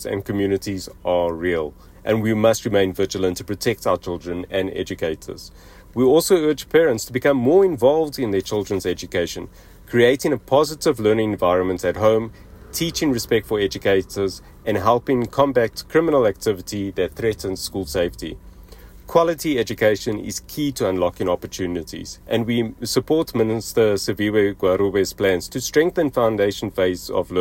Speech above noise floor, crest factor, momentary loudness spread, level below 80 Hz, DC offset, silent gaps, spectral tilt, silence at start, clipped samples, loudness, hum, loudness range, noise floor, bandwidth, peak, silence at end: 22 dB; 16 dB; 9 LU; -46 dBFS; under 0.1%; none; -5 dB/octave; 0 s; under 0.1%; -20 LUFS; none; 4 LU; -42 dBFS; 16.5 kHz; -4 dBFS; 0 s